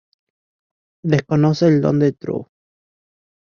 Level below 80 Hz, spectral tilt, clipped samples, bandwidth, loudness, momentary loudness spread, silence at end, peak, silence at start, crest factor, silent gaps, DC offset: -56 dBFS; -8 dB/octave; under 0.1%; 7 kHz; -17 LUFS; 13 LU; 1.05 s; -2 dBFS; 1.05 s; 18 dB; none; under 0.1%